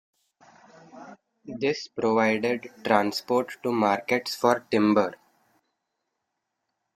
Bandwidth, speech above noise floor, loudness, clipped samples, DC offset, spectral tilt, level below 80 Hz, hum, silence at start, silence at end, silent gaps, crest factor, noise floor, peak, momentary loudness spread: 15 kHz; 57 dB; -25 LUFS; under 0.1%; under 0.1%; -5 dB/octave; -70 dBFS; none; 0.95 s; 1.8 s; none; 24 dB; -81 dBFS; -4 dBFS; 7 LU